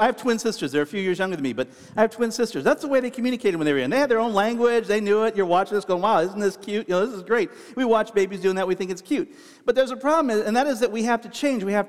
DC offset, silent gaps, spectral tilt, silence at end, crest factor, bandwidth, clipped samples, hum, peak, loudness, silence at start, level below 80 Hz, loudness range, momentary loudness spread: 0.2%; none; -5 dB/octave; 0 s; 18 dB; 15 kHz; under 0.1%; none; -4 dBFS; -23 LUFS; 0 s; -64 dBFS; 3 LU; 6 LU